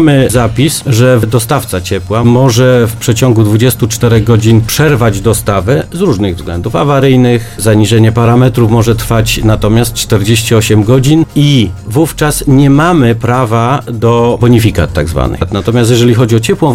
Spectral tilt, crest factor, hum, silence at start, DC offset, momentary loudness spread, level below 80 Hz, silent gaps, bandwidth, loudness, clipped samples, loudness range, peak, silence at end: -6 dB/octave; 8 dB; none; 0 s; 0.6%; 6 LU; -26 dBFS; none; 16.5 kHz; -8 LUFS; 0.9%; 1 LU; 0 dBFS; 0 s